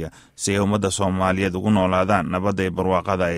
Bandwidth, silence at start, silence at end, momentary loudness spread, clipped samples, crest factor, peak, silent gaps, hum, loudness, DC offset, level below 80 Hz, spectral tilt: 14.5 kHz; 0 s; 0 s; 4 LU; under 0.1%; 16 dB; -4 dBFS; none; none; -21 LUFS; under 0.1%; -46 dBFS; -5.5 dB/octave